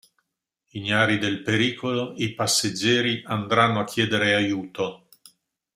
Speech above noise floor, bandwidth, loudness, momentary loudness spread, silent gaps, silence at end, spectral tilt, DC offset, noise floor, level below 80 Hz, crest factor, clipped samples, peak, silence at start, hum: 56 dB; 16 kHz; -23 LUFS; 9 LU; none; 0.8 s; -4 dB/octave; under 0.1%; -80 dBFS; -62 dBFS; 22 dB; under 0.1%; -4 dBFS; 0.75 s; none